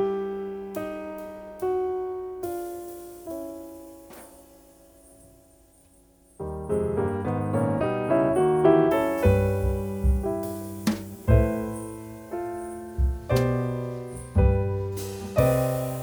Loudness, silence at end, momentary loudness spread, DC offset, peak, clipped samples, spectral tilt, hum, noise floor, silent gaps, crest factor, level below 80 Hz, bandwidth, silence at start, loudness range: -26 LUFS; 0 s; 16 LU; under 0.1%; -6 dBFS; under 0.1%; -7.5 dB/octave; none; -57 dBFS; none; 20 dB; -34 dBFS; over 20 kHz; 0 s; 16 LU